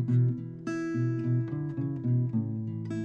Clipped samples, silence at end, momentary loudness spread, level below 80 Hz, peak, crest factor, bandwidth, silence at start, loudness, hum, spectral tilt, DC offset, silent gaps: under 0.1%; 0 s; 7 LU; -66 dBFS; -18 dBFS; 12 dB; 7.2 kHz; 0 s; -31 LUFS; none; -9.5 dB/octave; under 0.1%; none